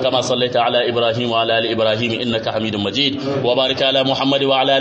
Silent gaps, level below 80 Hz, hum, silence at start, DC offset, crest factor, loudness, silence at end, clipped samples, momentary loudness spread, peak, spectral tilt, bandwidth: none; -54 dBFS; none; 0 s; under 0.1%; 14 dB; -17 LUFS; 0 s; under 0.1%; 5 LU; -2 dBFS; -4.5 dB/octave; 8.6 kHz